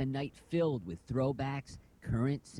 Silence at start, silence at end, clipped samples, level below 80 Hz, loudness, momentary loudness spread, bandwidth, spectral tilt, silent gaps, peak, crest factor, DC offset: 0 s; 0 s; under 0.1%; -54 dBFS; -35 LUFS; 10 LU; 11 kHz; -7.5 dB/octave; none; -22 dBFS; 14 dB; under 0.1%